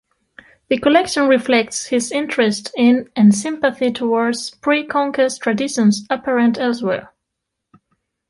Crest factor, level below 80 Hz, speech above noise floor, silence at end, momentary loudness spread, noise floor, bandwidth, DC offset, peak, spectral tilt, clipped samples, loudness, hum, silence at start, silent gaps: 16 dB; -60 dBFS; 62 dB; 1.25 s; 7 LU; -79 dBFS; 11.5 kHz; under 0.1%; -2 dBFS; -4.5 dB/octave; under 0.1%; -17 LUFS; none; 0.7 s; none